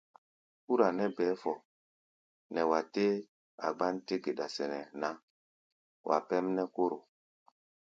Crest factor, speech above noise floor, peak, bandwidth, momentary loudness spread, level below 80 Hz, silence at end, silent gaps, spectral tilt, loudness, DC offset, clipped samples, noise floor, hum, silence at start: 24 dB; over 57 dB; -12 dBFS; 7.8 kHz; 9 LU; -82 dBFS; 0.8 s; 1.65-2.50 s, 3.28-3.58 s, 5.23-6.04 s; -6 dB/octave; -34 LUFS; under 0.1%; under 0.1%; under -90 dBFS; none; 0.7 s